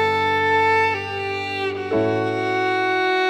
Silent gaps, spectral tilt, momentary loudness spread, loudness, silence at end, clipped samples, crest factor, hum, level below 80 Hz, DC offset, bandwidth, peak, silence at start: none; -5.5 dB/octave; 8 LU; -20 LUFS; 0 s; under 0.1%; 12 dB; none; -62 dBFS; under 0.1%; 13 kHz; -8 dBFS; 0 s